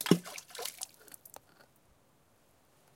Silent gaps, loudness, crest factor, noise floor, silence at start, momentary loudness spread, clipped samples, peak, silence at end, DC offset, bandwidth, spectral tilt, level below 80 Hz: none; -36 LUFS; 32 dB; -68 dBFS; 0 s; 23 LU; under 0.1%; -8 dBFS; 2.1 s; under 0.1%; 17 kHz; -4.5 dB/octave; -78 dBFS